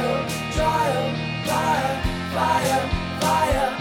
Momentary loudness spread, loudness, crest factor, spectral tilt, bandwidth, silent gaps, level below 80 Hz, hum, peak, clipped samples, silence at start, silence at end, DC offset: 6 LU; -22 LUFS; 14 dB; -4.5 dB/octave; 17.5 kHz; none; -36 dBFS; none; -8 dBFS; under 0.1%; 0 s; 0 s; under 0.1%